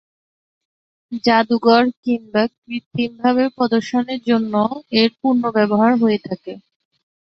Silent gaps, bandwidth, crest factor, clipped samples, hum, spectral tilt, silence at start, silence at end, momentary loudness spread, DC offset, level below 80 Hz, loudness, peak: 1.97-2.03 s, 2.58-2.62 s, 2.86-2.91 s; 6.6 kHz; 18 dB; under 0.1%; none; -6.5 dB/octave; 1.1 s; 0.7 s; 10 LU; under 0.1%; -62 dBFS; -17 LUFS; -2 dBFS